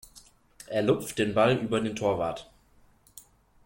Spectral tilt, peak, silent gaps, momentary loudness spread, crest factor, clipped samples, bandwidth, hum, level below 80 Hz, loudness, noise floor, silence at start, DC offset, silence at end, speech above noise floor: -5.5 dB/octave; -10 dBFS; none; 9 LU; 18 dB; under 0.1%; 16.5 kHz; none; -60 dBFS; -27 LUFS; -61 dBFS; 0.15 s; under 0.1%; 0.45 s; 34 dB